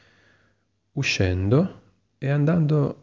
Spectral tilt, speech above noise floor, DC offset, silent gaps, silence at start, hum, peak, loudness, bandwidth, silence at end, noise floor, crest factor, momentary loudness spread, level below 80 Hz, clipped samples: -6.5 dB/octave; 47 dB; under 0.1%; none; 0.95 s; none; -8 dBFS; -23 LUFS; 7.4 kHz; 0.1 s; -68 dBFS; 16 dB; 9 LU; -42 dBFS; under 0.1%